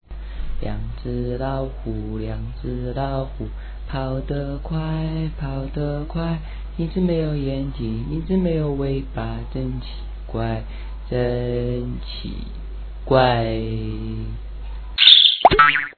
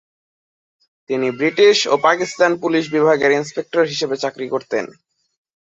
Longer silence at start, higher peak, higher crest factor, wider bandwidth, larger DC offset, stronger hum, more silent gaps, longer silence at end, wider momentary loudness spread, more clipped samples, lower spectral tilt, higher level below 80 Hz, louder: second, 0.1 s vs 1.1 s; about the same, 0 dBFS vs -2 dBFS; about the same, 22 dB vs 18 dB; second, 5.2 kHz vs 8 kHz; neither; neither; neither; second, 0.05 s vs 0.95 s; first, 20 LU vs 11 LU; neither; first, -7.5 dB/octave vs -4 dB/octave; first, -30 dBFS vs -66 dBFS; second, -20 LUFS vs -17 LUFS